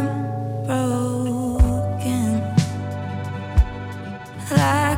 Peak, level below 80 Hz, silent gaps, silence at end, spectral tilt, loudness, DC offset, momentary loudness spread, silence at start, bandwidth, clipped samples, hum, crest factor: -4 dBFS; -28 dBFS; none; 0 s; -6.5 dB/octave; -22 LUFS; under 0.1%; 11 LU; 0 s; 17 kHz; under 0.1%; none; 16 dB